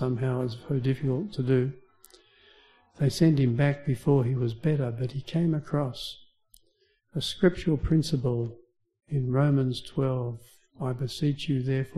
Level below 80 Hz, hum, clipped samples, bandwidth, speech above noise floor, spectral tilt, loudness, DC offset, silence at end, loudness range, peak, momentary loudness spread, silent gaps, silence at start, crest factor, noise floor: -48 dBFS; none; under 0.1%; 12.5 kHz; 43 dB; -7.5 dB/octave; -28 LUFS; under 0.1%; 0 s; 3 LU; -8 dBFS; 10 LU; none; 0 s; 20 dB; -69 dBFS